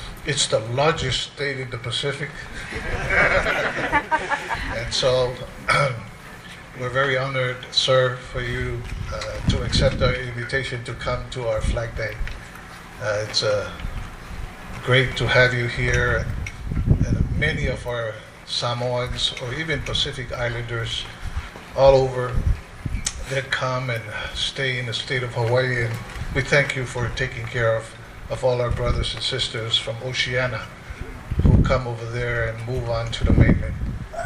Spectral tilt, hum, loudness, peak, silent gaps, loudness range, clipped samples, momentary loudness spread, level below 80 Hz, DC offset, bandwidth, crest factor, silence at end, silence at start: -4.5 dB/octave; none; -23 LUFS; -2 dBFS; none; 4 LU; under 0.1%; 13 LU; -32 dBFS; under 0.1%; 14 kHz; 20 dB; 0 s; 0 s